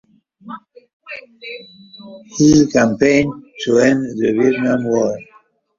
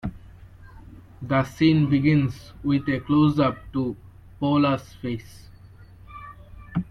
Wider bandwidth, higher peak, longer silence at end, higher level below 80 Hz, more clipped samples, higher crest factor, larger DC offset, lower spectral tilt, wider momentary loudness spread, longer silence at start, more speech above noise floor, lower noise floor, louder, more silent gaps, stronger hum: second, 7.6 kHz vs 10.5 kHz; first, 0 dBFS vs -6 dBFS; first, 0.55 s vs 0.05 s; about the same, -48 dBFS vs -48 dBFS; neither; about the same, 16 dB vs 18 dB; neither; second, -5.5 dB/octave vs -8 dB/octave; about the same, 23 LU vs 22 LU; first, 0.45 s vs 0.05 s; first, 37 dB vs 25 dB; first, -52 dBFS vs -47 dBFS; first, -15 LUFS vs -23 LUFS; first, 0.93-1.00 s vs none; neither